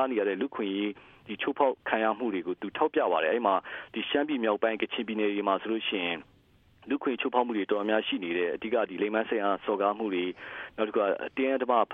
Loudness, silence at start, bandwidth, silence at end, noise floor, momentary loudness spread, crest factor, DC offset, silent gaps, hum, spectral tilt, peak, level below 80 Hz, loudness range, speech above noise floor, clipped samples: -29 LUFS; 0 s; 3.9 kHz; 0 s; -62 dBFS; 8 LU; 18 dB; under 0.1%; none; none; -7.5 dB/octave; -10 dBFS; -72 dBFS; 2 LU; 33 dB; under 0.1%